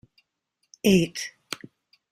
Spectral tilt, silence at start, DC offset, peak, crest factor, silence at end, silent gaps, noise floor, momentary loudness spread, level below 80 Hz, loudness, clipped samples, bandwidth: -5 dB/octave; 0.85 s; under 0.1%; -6 dBFS; 20 dB; 0.55 s; none; -77 dBFS; 16 LU; -58 dBFS; -24 LUFS; under 0.1%; 15.5 kHz